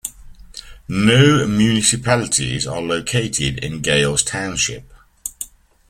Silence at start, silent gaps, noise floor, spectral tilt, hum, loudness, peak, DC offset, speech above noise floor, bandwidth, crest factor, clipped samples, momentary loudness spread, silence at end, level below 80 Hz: 0.05 s; none; -39 dBFS; -4 dB/octave; none; -17 LUFS; 0 dBFS; under 0.1%; 22 dB; 16 kHz; 18 dB; under 0.1%; 19 LU; 0.45 s; -42 dBFS